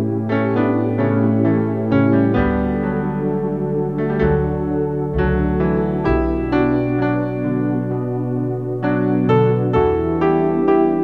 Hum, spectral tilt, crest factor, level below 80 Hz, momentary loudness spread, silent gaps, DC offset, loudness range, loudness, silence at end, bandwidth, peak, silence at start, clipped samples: none; -10.5 dB/octave; 14 dB; -32 dBFS; 5 LU; none; 0.6%; 2 LU; -18 LUFS; 0 s; 5.4 kHz; -2 dBFS; 0 s; under 0.1%